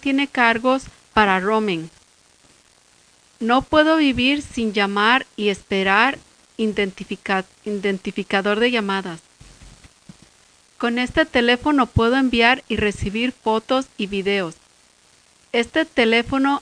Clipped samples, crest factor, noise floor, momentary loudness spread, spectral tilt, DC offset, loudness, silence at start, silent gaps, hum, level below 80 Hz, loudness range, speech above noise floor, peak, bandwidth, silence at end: under 0.1%; 20 dB; -55 dBFS; 10 LU; -5 dB/octave; under 0.1%; -19 LUFS; 0 s; none; none; -44 dBFS; 5 LU; 36 dB; 0 dBFS; 10.5 kHz; 0 s